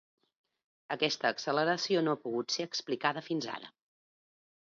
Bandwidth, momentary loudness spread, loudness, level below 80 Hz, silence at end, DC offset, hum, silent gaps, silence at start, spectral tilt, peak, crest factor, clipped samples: 7.6 kHz; 11 LU; -32 LUFS; -84 dBFS; 0.95 s; under 0.1%; none; none; 0.9 s; -3.5 dB/octave; -14 dBFS; 22 dB; under 0.1%